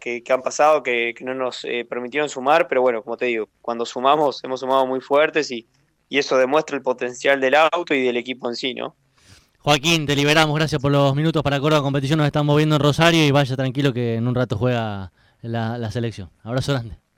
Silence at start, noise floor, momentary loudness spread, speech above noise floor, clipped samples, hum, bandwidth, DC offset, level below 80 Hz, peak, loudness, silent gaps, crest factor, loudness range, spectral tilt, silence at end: 0 s; -52 dBFS; 11 LU; 33 dB; under 0.1%; none; 16.5 kHz; under 0.1%; -50 dBFS; 0 dBFS; -20 LUFS; none; 20 dB; 4 LU; -5.5 dB/octave; 0.2 s